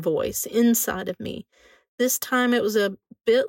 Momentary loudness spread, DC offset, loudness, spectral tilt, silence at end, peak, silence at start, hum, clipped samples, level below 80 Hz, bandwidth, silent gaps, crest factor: 12 LU; under 0.1%; -23 LUFS; -3.5 dB/octave; 0 s; -10 dBFS; 0 s; none; under 0.1%; -58 dBFS; 16.5 kHz; 1.88-1.98 s; 14 dB